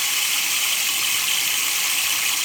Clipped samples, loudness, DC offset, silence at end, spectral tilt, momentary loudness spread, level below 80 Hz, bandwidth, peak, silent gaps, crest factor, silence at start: under 0.1%; -18 LUFS; under 0.1%; 0 s; 3 dB/octave; 0 LU; -72 dBFS; over 20 kHz; -8 dBFS; none; 14 dB; 0 s